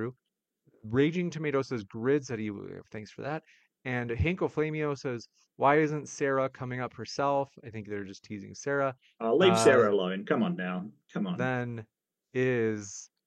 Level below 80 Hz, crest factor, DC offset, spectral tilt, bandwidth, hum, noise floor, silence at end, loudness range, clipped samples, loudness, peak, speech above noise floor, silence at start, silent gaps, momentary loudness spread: -56 dBFS; 22 dB; under 0.1%; -5.5 dB/octave; 12.5 kHz; none; -84 dBFS; 0.2 s; 6 LU; under 0.1%; -30 LUFS; -8 dBFS; 54 dB; 0 s; none; 17 LU